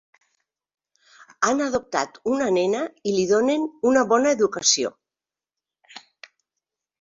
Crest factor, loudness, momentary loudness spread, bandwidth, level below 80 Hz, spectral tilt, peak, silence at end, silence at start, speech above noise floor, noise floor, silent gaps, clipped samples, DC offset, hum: 20 dB; -21 LUFS; 7 LU; 7.8 kHz; -64 dBFS; -2.5 dB/octave; -4 dBFS; 1 s; 1.4 s; over 69 dB; under -90 dBFS; none; under 0.1%; under 0.1%; none